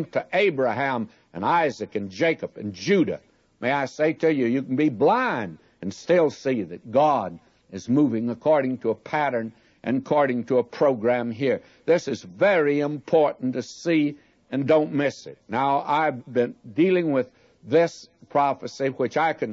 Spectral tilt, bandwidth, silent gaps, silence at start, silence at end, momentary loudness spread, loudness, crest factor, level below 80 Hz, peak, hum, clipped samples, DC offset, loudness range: -6.5 dB/octave; 7.8 kHz; none; 0 s; 0 s; 10 LU; -23 LUFS; 16 dB; -70 dBFS; -8 dBFS; none; under 0.1%; under 0.1%; 2 LU